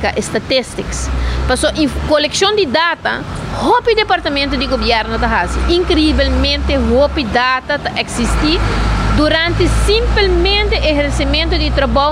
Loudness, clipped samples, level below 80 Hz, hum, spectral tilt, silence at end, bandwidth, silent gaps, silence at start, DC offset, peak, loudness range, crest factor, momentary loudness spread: -14 LUFS; under 0.1%; -20 dBFS; none; -4.5 dB/octave; 0 s; 12.5 kHz; none; 0 s; under 0.1%; -2 dBFS; 1 LU; 12 dB; 6 LU